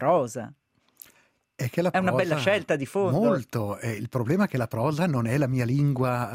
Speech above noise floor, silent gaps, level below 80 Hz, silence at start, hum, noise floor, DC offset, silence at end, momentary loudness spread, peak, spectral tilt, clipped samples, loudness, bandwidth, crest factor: 39 dB; none; -60 dBFS; 0 s; none; -64 dBFS; under 0.1%; 0 s; 7 LU; -10 dBFS; -7 dB/octave; under 0.1%; -25 LUFS; 16 kHz; 16 dB